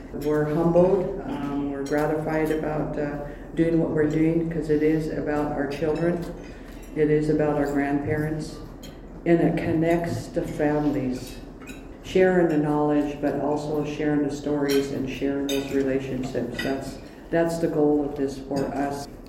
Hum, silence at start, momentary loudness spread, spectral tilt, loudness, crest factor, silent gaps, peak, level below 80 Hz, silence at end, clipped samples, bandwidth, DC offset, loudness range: none; 0 s; 13 LU; -7 dB/octave; -25 LUFS; 18 dB; none; -6 dBFS; -44 dBFS; 0 s; under 0.1%; 16.5 kHz; under 0.1%; 2 LU